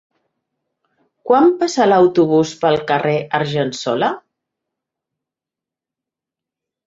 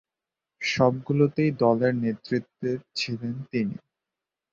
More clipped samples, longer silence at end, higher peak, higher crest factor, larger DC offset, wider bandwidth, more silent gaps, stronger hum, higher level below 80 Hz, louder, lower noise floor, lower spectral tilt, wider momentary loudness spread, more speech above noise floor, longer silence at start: neither; first, 2.65 s vs 0.8 s; first, -2 dBFS vs -6 dBFS; about the same, 16 dB vs 20 dB; neither; about the same, 7.8 kHz vs 7.6 kHz; neither; neither; about the same, -62 dBFS vs -64 dBFS; first, -16 LUFS vs -26 LUFS; about the same, -87 dBFS vs -88 dBFS; about the same, -5.5 dB/octave vs -6.5 dB/octave; about the same, 8 LU vs 9 LU; first, 72 dB vs 63 dB; first, 1.25 s vs 0.6 s